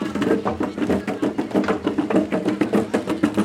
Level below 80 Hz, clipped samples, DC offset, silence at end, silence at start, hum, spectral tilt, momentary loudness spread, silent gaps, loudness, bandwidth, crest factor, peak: -54 dBFS; under 0.1%; under 0.1%; 0 s; 0 s; none; -6.5 dB/octave; 4 LU; none; -22 LUFS; 14 kHz; 18 dB; -2 dBFS